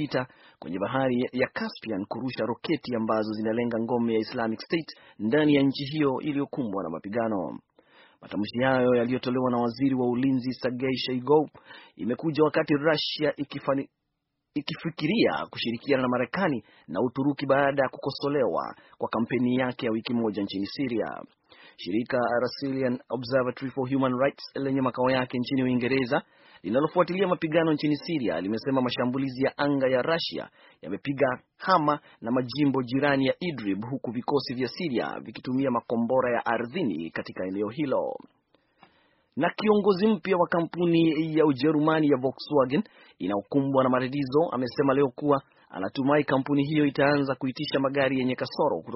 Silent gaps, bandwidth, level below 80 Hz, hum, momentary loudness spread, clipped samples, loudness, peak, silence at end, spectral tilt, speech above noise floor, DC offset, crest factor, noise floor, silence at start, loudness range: none; 6 kHz; -64 dBFS; none; 9 LU; under 0.1%; -27 LUFS; -6 dBFS; 0 s; -5 dB/octave; 54 dB; under 0.1%; 20 dB; -80 dBFS; 0 s; 4 LU